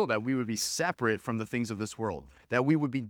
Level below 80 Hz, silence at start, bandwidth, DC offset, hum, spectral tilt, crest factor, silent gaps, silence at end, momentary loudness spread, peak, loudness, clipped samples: -64 dBFS; 0 s; 19.5 kHz; under 0.1%; none; -4.5 dB/octave; 20 dB; none; 0 s; 8 LU; -12 dBFS; -31 LUFS; under 0.1%